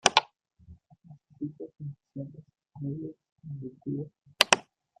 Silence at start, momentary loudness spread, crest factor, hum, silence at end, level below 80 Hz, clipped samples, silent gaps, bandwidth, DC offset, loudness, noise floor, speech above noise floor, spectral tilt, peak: 0.05 s; 21 LU; 32 dB; none; 0.4 s; -68 dBFS; under 0.1%; 3.32-3.36 s; 14.5 kHz; under 0.1%; -30 LUFS; -55 dBFS; 17 dB; -2.5 dB/octave; 0 dBFS